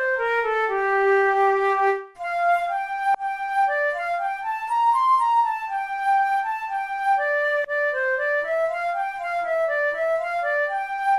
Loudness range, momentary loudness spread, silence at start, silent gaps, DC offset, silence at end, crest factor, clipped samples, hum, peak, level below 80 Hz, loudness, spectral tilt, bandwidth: 2 LU; 8 LU; 0 s; none; under 0.1%; 0 s; 12 dB; under 0.1%; none; -10 dBFS; -62 dBFS; -22 LUFS; -3 dB/octave; 13.5 kHz